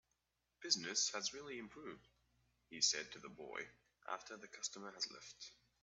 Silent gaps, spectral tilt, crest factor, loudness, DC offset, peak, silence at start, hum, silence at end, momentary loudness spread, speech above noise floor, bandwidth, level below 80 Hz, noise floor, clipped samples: none; 0 dB/octave; 26 dB; -42 LUFS; under 0.1%; -20 dBFS; 0.6 s; 60 Hz at -75 dBFS; 0.3 s; 19 LU; 41 dB; 8.2 kHz; -82 dBFS; -86 dBFS; under 0.1%